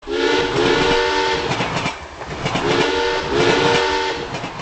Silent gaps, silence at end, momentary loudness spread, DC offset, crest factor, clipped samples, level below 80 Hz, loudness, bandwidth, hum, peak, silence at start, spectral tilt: none; 0 s; 10 LU; under 0.1%; 16 dB; under 0.1%; -38 dBFS; -18 LUFS; 9 kHz; none; -4 dBFS; 0.05 s; -4 dB/octave